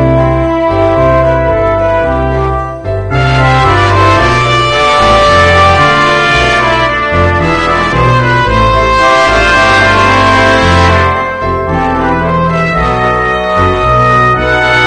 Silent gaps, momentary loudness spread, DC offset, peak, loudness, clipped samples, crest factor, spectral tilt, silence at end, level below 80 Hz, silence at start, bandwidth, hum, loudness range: none; 6 LU; under 0.1%; 0 dBFS; -8 LUFS; 0.8%; 8 dB; -5.5 dB/octave; 0 s; -22 dBFS; 0 s; 10 kHz; none; 3 LU